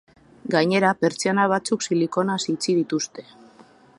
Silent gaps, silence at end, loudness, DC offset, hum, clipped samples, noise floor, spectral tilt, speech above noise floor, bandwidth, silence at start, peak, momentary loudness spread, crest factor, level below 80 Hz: none; 0.75 s; -22 LUFS; under 0.1%; none; under 0.1%; -51 dBFS; -4.5 dB/octave; 30 dB; 11.5 kHz; 0.45 s; -4 dBFS; 8 LU; 20 dB; -68 dBFS